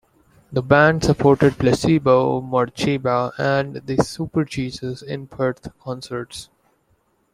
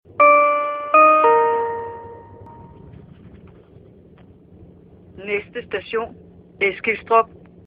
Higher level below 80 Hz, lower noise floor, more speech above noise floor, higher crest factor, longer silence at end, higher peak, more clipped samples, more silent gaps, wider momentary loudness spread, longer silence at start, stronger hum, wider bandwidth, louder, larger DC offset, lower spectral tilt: first, -46 dBFS vs -56 dBFS; first, -64 dBFS vs -47 dBFS; first, 44 dB vs 25 dB; about the same, 18 dB vs 18 dB; first, 0.9 s vs 0.4 s; about the same, -2 dBFS vs -2 dBFS; neither; neither; second, 15 LU vs 20 LU; first, 0.5 s vs 0.2 s; neither; first, 14.5 kHz vs 4.9 kHz; about the same, -19 LUFS vs -17 LUFS; neither; second, -6.5 dB/octave vs -8.5 dB/octave